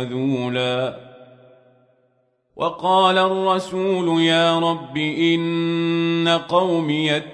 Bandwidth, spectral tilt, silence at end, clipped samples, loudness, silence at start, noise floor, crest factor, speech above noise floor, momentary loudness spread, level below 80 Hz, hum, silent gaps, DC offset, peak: 10.5 kHz; -5.5 dB/octave; 0 s; under 0.1%; -19 LUFS; 0 s; -65 dBFS; 16 dB; 45 dB; 8 LU; -66 dBFS; none; none; under 0.1%; -4 dBFS